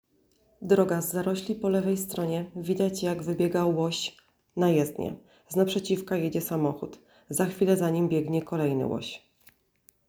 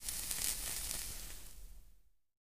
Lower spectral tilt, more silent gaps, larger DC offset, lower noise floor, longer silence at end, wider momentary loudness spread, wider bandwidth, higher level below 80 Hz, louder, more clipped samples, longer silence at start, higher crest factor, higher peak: first, -6 dB/octave vs 0 dB/octave; neither; second, under 0.1% vs 0.3%; about the same, -66 dBFS vs -65 dBFS; first, 0.9 s vs 0.1 s; second, 11 LU vs 18 LU; first, over 20 kHz vs 16 kHz; second, -64 dBFS vs -54 dBFS; first, -28 LUFS vs -39 LUFS; neither; first, 0.6 s vs 0 s; second, 20 dB vs 30 dB; first, -8 dBFS vs -14 dBFS